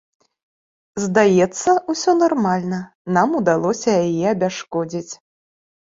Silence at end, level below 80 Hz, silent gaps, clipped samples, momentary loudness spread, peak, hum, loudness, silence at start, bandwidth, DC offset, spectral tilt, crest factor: 0.7 s; -60 dBFS; 2.95-3.05 s; under 0.1%; 12 LU; -2 dBFS; none; -18 LUFS; 0.95 s; 7.8 kHz; under 0.1%; -5.5 dB/octave; 18 dB